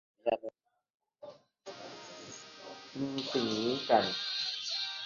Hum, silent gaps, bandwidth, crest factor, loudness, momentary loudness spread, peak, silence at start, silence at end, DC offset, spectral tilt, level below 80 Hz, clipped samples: none; 0.90-1.00 s; 7.2 kHz; 24 dB; -33 LUFS; 23 LU; -12 dBFS; 0.25 s; 0 s; under 0.1%; -2 dB/octave; -76 dBFS; under 0.1%